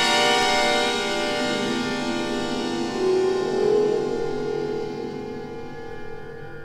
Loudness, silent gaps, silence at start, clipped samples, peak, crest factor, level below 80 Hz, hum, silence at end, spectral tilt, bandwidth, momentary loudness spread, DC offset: -23 LUFS; none; 0 s; under 0.1%; -6 dBFS; 16 dB; -48 dBFS; none; 0 s; -3.5 dB/octave; 15.5 kHz; 17 LU; under 0.1%